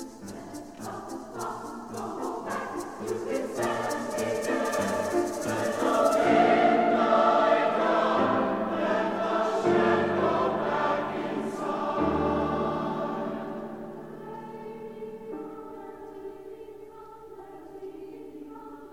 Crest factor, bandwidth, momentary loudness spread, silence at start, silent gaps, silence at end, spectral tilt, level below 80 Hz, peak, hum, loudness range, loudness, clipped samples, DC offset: 18 dB; 16.5 kHz; 21 LU; 0 s; none; 0 s; -5 dB/octave; -58 dBFS; -10 dBFS; none; 18 LU; -27 LUFS; under 0.1%; 0.1%